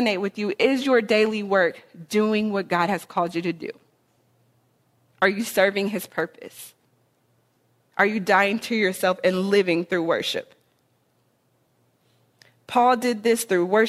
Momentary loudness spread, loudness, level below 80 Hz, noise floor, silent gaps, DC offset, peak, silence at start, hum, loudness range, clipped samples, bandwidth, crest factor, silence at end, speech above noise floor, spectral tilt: 11 LU; -22 LUFS; -70 dBFS; -67 dBFS; none; under 0.1%; -4 dBFS; 0 s; none; 5 LU; under 0.1%; 15.5 kHz; 20 dB; 0 s; 44 dB; -4.5 dB/octave